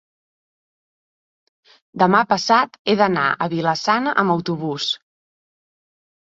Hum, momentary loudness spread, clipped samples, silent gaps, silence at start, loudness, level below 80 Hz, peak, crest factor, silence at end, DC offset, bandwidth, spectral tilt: none; 8 LU; under 0.1%; 2.79-2.85 s; 1.95 s; -19 LUFS; -64 dBFS; -2 dBFS; 20 dB; 1.25 s; under 0.1%; 7.8 kHz; -5 dB/octave